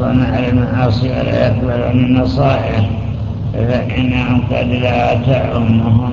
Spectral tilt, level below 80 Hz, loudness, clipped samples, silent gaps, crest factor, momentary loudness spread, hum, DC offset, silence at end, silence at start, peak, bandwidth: -9 dB/octave; -26 dBFS; -14 LUFS; under 0.1%; none; 12 dB; 4 LU; none; under 0.1%; 0 s; 0 s; 0 dBFS; 7 kHz